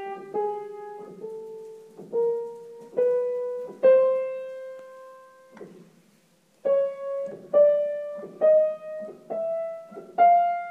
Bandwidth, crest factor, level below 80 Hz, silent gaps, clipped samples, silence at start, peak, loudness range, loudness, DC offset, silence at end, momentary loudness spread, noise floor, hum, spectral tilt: 4.6 kHz; 18 dB; -86 dBFS; none; under 0.1%; 0 s; -8 dBFS; 6 LU; -24 LUFS; under 0.1%; 0 s; 21 LU; -62 dBFS; none; -6.5 dB/octave